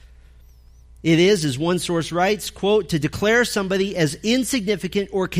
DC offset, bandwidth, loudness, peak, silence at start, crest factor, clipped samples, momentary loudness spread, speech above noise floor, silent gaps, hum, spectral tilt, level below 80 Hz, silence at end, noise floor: under 0.1%; 15.5 kHz; -20 LUFS; -6 dBFS; 0.05 s; 16 dB; under 0.1%; 6 LU; 28 dB; none; none; -4.5 dB/octave; -46 dBFS; 0 s; -47 dBFS